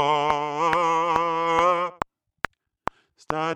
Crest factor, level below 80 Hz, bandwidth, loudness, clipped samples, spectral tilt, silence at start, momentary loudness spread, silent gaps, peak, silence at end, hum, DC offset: 22 dB; -54 dBFS; 13 kHz; -23 LUFS; under 0.1%; -4.5 dB/octave; 0 s; 14 LU; none; -2 dBFS; 0 s; none; under 0.1%